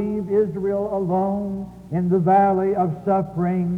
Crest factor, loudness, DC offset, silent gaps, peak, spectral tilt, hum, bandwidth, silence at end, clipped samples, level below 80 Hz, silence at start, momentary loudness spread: 14 dB; -21 LUFS; under 0.1%; none; -8 dBFS; -10.5 dB/octave; none; 3.7 kHz; 0 s; under 0.1%; -50 dBFS; 0 s; 9 LU